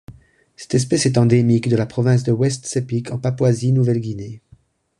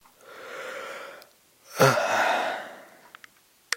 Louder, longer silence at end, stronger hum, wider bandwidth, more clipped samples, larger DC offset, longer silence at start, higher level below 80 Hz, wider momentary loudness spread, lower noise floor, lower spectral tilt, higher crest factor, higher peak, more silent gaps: first, -18 LUFS vs -25 LUFS; first, 0.6 s vs 0 s; neither; second, 11 kHz vs 16.5 kHz; neither; neither; second, 0.1 s vs 0.3 s; first, -50 dBFS vs -74 dBFS; second, 9 LU vs 23 LU; about the same, -53 dBFS vs -56 dBFS; first, -6.5 dB/octave vs -3.5 dB/octave; second, 16 dB vs 24 dB; about the same, -2 dBFS vs -4 dBFS; neither